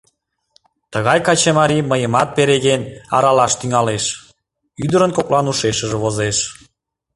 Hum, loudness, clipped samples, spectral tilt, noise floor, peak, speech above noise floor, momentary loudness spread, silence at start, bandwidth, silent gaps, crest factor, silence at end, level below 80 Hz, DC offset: none; -16 LUFS; under 0.1%; -4 dB/octave; -65 dBFS; 0 dBFS; 49 dB; 8 LU; 0.9 s; 11.5 kHz; none; 16 dB; 0.65 s; -48 dBFS; under 0.1%